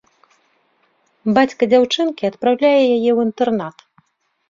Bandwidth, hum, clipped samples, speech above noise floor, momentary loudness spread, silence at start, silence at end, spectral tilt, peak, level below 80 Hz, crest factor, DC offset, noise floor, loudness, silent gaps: 7.6 kHz; none; under 0.1%; 48 dB; 8 LU; 1.25 s; 0.8 s; -5.5 dB/octave; -2 dBFS; -62 dBFS; 16 dB; under 0.1%; -64 dBFS; -16 LUFS; none